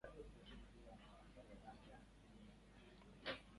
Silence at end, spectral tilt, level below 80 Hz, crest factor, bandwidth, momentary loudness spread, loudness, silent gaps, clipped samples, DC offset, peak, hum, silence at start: 0 s; -5 dB/octave; -66 dBFS; 24 dB; 11 kHz; 12 LU; -60 LUFS; none; under 0.1%; under 0.1%; -34 dBFS; none; 0 s